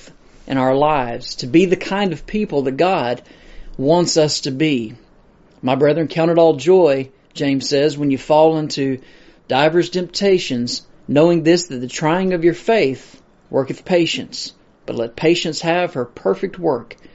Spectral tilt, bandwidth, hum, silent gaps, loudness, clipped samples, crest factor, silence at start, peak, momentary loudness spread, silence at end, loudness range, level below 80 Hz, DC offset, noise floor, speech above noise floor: -4.5 dB/octave; 8 kHz; none; none; -17 LUFS; under 0.1%; 16 dB; 0.45 s; 0 dBFS; 12 LU; 0.2 s; 4 LU; -46 dBFS; under 0.1%; -50 dBFS; 33 dB